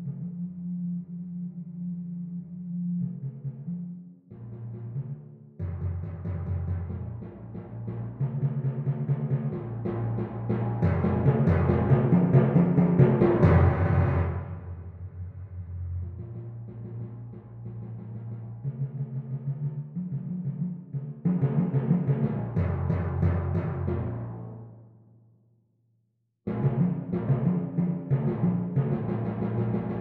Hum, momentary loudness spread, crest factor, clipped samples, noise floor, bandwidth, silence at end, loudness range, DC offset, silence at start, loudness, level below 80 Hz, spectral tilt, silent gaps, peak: none; 18 LU; 22 dB; under 0.1%; -73 dBFS; 4.1 kHz; 0 s; 14 LU; under 0.1%; 0 s; -28 LUFS; -46 dBFS; -12 dB/octave; none; -6 dBFS